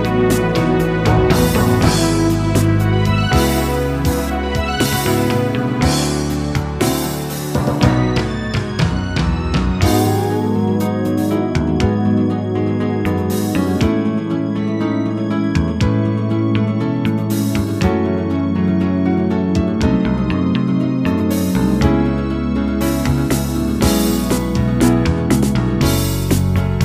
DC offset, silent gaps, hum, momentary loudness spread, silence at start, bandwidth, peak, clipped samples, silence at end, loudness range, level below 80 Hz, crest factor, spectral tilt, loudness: under 0.1%; none; none; 4 LU; 0 s; 15.5 kHz; 0 dBFS; under 0.1%; 0 s; 3 LU; -28 dBFS; 16 dB; -6 dB/octave; -17 LUFS